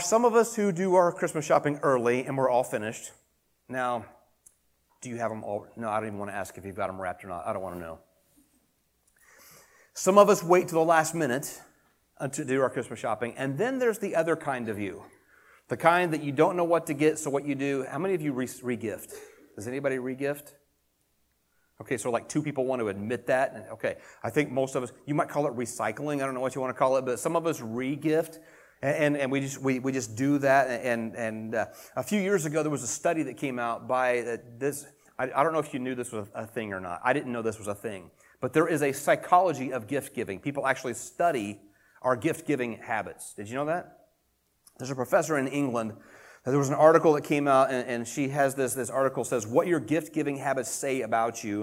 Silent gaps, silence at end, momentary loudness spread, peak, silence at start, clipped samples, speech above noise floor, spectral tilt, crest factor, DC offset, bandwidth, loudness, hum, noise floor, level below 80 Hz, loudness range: none; 0 s; 13 LU; -4 dBFS; 0 s; under 0.1%; 45 dB; -5 dB/octave; 24 dB; under 0.1%; 16.5 kHz; -28 LUFS; none; -72 dBFS; -70 dBFS; 9 LU